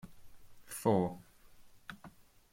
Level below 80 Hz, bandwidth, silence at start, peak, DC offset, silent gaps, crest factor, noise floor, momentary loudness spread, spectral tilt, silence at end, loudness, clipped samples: -66 dBFS; 16.5 kHz; 0.05 s; -16 dBFS; under 0.1%; none; 22 dB; -58 dBFS; 25 LU; -6.5 dB/octave; 0.45 s; -34 LUFS; under 0.1%